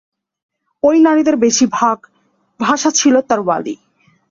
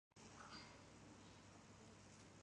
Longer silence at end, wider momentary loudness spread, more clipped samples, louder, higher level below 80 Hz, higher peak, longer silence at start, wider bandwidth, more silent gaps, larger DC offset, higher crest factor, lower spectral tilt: first, 0.55 s vs 0 s; first, 10 LU vs 6 LU; neither; first, -13 LUFS vs -62 LUFS; first, -60 dBFS vs -78 dBFS; first, 0 dBFS vs -44 dBFS; first, 0.85 s vs 0.15 s; second, 7.6 kHz vs 11 kHz; neither; neither; about the same, 14 dB vs 18 dB; about the same, -3 dB/octave vs -3.5 dB/octave